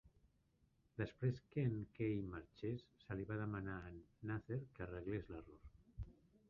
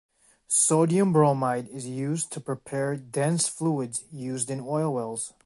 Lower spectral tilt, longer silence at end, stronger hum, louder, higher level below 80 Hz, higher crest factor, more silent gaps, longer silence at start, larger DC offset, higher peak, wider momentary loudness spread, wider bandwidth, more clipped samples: first, -8 dB/octave vs -5 dB/octave; first, 0.35 s vs 0.15 s; neither; second, -47 LUFS vs -26 LUFS; first, -64 dBFS vs -70 dBFS; about the same, 18 dB vs 18 dB; neither; second, 0.05 s vs 0.5 s; neither; second, -28 dBFS vs -8 dBFS; about the same, 14 LU vs 12 LU; second, 6.8 kHz vs 11.5 kHz; neither